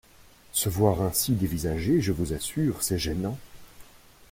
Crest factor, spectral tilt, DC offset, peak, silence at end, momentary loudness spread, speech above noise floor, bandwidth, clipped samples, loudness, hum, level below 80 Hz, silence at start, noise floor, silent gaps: 20 dB; -5 dB/octave; under 0.1%; -8 dBFS; 0.5 s; 7 LU; 28 dB; 16.5 kHz; under 0.1%; -27 LUFS; none; -46 dBFS; 0.55 s; -54 dBFS; none